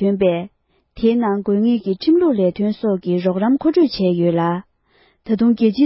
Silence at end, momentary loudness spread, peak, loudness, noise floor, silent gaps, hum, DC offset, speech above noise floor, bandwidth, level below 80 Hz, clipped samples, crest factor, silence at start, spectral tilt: 0 s; 6 LU; -4 dBFS; -18 LUFS; -57 dBFS; none; none; under 0.1%; 41 dB; 5.8 kHz; -52 dBFS; under 0.1%; 12 dB; 0 s; -12 dB/octave